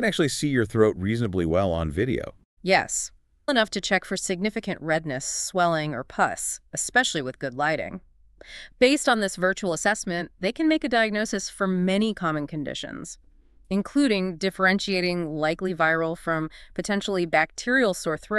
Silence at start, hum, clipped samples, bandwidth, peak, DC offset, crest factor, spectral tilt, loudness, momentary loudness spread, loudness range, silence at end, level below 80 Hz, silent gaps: 0 s; none; under 0.1%; 13.5 kHz; -6 dBFS; under 0.1%; 20 dB; -4 dB/octave; -25 LUFS; 10 LU; 2 LU; 0 s; -50 dBFS; 2.45-2.57 s